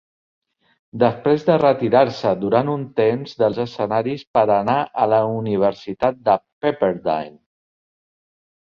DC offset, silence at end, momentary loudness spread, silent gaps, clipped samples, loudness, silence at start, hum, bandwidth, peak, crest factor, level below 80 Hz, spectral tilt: under 0.1%; 1.3 s; 7 LU; 4.27-4.34 s, 6.52-6.61 s; under 0.1%; -19 LUFS; 0.95 s; none; 7 kHz; -2 dBFS; 18 dB; -58 dBFS; -8 dB/octave